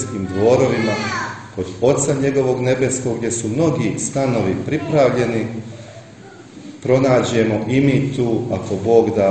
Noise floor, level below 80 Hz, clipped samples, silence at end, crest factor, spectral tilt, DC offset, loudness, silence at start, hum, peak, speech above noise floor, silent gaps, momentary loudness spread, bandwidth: -40 dBFS; -50 dBFS; under 0.1%; 0 s; 18 dB; -6 dB/octave; under 0.1%; -18 LUFS; 0 s; none; 0 dBFS; 23 dB; none; 13 LU; 9.2 kHz